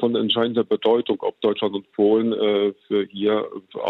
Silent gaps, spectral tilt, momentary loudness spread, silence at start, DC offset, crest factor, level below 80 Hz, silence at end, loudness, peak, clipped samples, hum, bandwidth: none; -8 dB/octave; 6 LU; 0 s; under 0.1%; 14 dB; -70 dBFS; 0 s; -21 LUFS; -8 dBFS; under 0.1%; none; 4.2 kHz